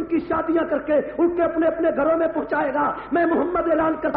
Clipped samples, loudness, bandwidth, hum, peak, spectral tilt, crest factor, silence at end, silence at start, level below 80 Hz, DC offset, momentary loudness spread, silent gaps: under 0.1%; -21 LUFS; 4.4 kHz; none; -10 dBFS; -5 dB/octave; 12 dB; 0 s; 0 s; -50 dBFS; under 0.1%; 3 LU; none